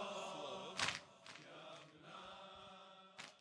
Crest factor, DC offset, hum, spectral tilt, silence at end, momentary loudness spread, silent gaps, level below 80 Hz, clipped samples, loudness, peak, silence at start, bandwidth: 28 dB; under 0.1%; none; -2 dB/octave; 0 s; 16 LU; none; -82 dBFS; under 0.1%; -48 LUFS; -22 dBFS; 0 s; 11 kHz